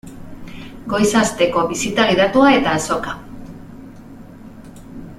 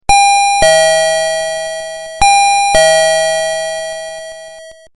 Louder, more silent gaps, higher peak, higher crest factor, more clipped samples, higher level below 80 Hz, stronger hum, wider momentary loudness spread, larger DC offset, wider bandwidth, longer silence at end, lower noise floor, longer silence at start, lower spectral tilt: second, -16 LUFS vs -10 LUFS; neither; about the same, 0 dBFS vs 0 dBFS; first, 18 dB vs 12 dB; neither; second, -44 dBFS vs -34 dBFS; neither; first, 25 LU vs 16 LU; neither; first, 15 kHz vs 11.5 kHz; second, 0.05 s vs 0.25 s; first, -38 dBFS vs -34 dBFS; about the same, 0.05 s vs 0.1 s; first, -4 dB/octave vs -0.5 dB/octave